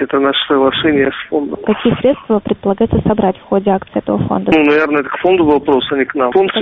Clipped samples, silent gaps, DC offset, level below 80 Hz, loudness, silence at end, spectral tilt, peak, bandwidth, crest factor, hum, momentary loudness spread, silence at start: under 0.1%; none; under 0.1%; -38 dBFS; -13 LUFS; 0 s; -4 dB/octave; 0 dBFS; 5.4 kHz; 14 dB; none; 6 LU; 0 s